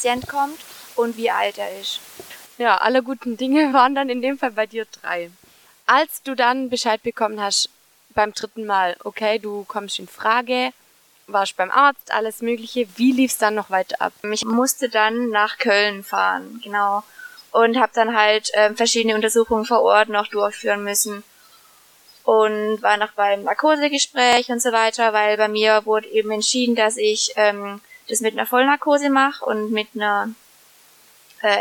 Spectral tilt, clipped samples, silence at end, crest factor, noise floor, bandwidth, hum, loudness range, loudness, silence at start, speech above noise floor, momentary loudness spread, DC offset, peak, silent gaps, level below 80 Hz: -2 dB/octave; under 0.1%; 0 s; 20 dB; -52 dBFS; 19 kHz; none; 4 LU; -19 LUFS; 0 s; 33 dB; 11 LU; under 0.1%; 0 dBFS; none; -62 dBFS